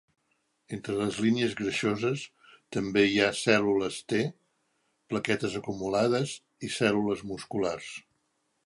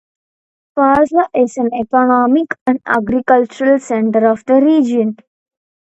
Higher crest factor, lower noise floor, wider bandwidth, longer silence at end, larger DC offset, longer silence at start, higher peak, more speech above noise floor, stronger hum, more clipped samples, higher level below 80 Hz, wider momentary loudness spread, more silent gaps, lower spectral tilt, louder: first, 22 dB vs 14 dB; second, -76 dBFS vs under -90 dBFS; first, 11.5 kHz vs 8.2 kHz; second, 0.65 s vs 0.8 s; neither; about the same, 0.7 s vs 0.75 s; second, -6 dBFS vs 0 dBFS; second, 47 dB vs over 77 dB; neither; neither; second, -64 dBFS vs -52 dBFS; first, 12 LU vs 6 LU; second, none vs 2.61-2.66 s; second, -5 dB/octave vs -6.5 dB/octave; second, -29 LUFS vs -13 LUFS